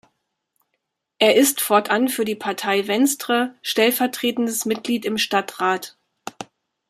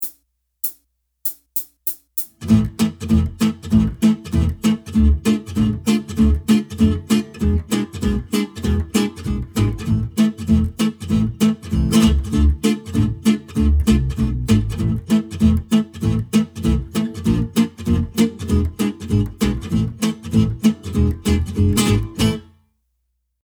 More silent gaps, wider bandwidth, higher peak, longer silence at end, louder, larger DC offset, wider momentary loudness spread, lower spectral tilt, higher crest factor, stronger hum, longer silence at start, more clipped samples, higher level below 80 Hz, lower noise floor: neither; second, 15.5 kHz vs over 20 kHz; about the same, -2 dBFS vs -2 dBFS; second, 0.45 s vs 1 s; about the same, -20 LUFS vs -19 LUFS; neither; first, 19 LU vs 6 LU; second, -2.5 dB/octave vs -6.5 dB/octave; about the same, 20 dB vs 16 dB; neither; first, 1.2 s vs 0 s; neither; second, -70 dBFS vs -26 dBFS; first, -77 dBFS vs -71 dBFS